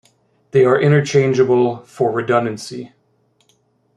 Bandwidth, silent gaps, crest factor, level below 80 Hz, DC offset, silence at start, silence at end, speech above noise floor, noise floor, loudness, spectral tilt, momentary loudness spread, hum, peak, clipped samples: 11 kHz; none; 16 dB; -60 dBFS; under 0.1%; 0.55 s; 1.1 s; 46 dB; -61 dBFS; -16 LUFS; -6.5 dB/octave; 14 LU; none; -2 dBFS; under 0.1%